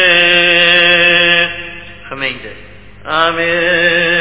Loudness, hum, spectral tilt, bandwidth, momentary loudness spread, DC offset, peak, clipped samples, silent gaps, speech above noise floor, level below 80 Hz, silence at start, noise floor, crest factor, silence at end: -9 LUFS; 50 Hz at -40 dBFS; -7 dB/octave; 4 kHz; 19 LU; 1%; 0 dBFS; 0.2%; none; 24 dB; -44 dBFS; 0 s; -36 dBFS; 12 dB; 0 s